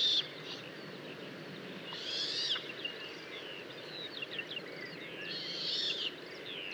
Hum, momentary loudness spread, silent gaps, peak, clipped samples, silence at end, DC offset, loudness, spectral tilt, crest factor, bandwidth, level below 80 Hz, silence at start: none; 13 LU; none; -20 dBFS; under 0.1%; 0 s; under 0.1%; -38 LUFS; -2.5 dB/octave; 18 dB; over 20 kHz; -86 dBFS; 0 s